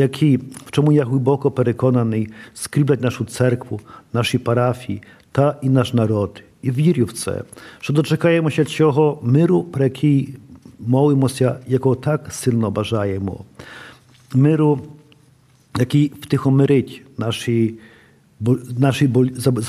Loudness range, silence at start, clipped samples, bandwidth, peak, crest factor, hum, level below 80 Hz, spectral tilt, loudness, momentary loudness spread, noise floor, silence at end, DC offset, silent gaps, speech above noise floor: 3 LU; 0 s; under 0.1%; 14.5 kHz; -2 dBFS; 16 dB; none; -56 dBFS; -7 dB/octave; -18 LUFS; 13 LU; -53 dBFS; 0 s; under 0.1%; none; 36 dB